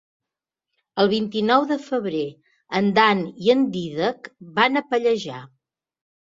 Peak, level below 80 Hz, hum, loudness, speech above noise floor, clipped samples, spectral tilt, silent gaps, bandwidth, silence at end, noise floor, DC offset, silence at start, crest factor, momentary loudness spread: -2 dBFS; -64 dBFS; none; -21 LUFS; 65 dB; under 0.1%; -6 dB/octave; none; 7.8 kHz; 0.85 s; -86 dBFS; under 0.1%; 0.95 s; 20 dB; 12 LU